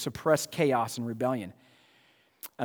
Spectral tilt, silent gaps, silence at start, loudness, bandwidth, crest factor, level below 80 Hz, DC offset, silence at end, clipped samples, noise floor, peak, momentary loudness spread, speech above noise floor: -5 dB/octave; none; 0 s; -29 LUFS; over 20 kHz; 22 dB; -68 dBFS; under 0.1%; 0 s; under 0.1%; -65 dBFS; -10 dBFS; 18 LU; 36 dB